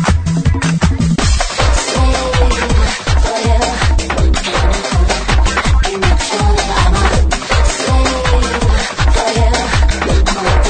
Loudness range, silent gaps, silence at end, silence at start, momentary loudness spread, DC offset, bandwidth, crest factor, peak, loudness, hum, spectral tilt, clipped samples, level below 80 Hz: 1 LU; none; 0 s; 0 s; 2 LU; under 0.1%; 9.4 kHz; 12 dB; 0 dBFS; -13 LUFS; none; -4.5 dB/octave; under 0.1%; -14 dBFS